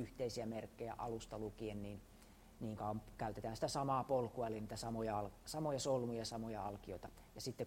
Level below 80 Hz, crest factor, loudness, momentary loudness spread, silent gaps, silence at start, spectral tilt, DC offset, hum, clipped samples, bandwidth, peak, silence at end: -62 dBFS; 18 dB; -44 LUFS; 13 LU; none; 0 s; -5.5 dB/octave; under 0.1%; none; under 0.1%; 16 kHz; -26 dBFS; 0 s